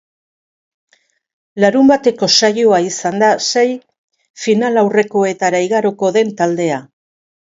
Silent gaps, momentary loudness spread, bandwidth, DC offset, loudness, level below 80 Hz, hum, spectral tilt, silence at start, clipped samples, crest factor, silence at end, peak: 3.98-4.08 s, 4.30-4.34 s; 8 LU; 7.8 kHz; under 0.1%; -14 LUFS; -62 dBFS; none; -4 dB/octave; 1.55 s; under 0.1%; 16 dB; 0.75 s; 0 dBFS